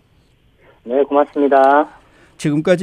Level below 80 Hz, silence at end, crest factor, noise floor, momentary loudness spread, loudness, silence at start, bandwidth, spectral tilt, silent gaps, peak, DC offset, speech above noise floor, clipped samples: -58 dBFS; 0 s; 16 dB; -54 dBFS; 11 LU; -15 LUFS; 0.85 s; 11.5 kHz; -6.5 dB/octave; none; -2 dBFS; under 0.1%; 40 dB; under 0.1%